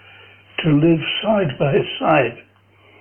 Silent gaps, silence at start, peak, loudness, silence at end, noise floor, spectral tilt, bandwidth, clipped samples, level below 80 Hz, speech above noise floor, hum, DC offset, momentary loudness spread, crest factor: none; 0.6 s; 0 dBFS; -18 LUFS; 0.6 s; -52 dBFS; -10 dB/octave; 3.4 kHz; under 0.1%; -50 dBFS; 35 dB; none; under 0.1%; 8 LU; 18 dB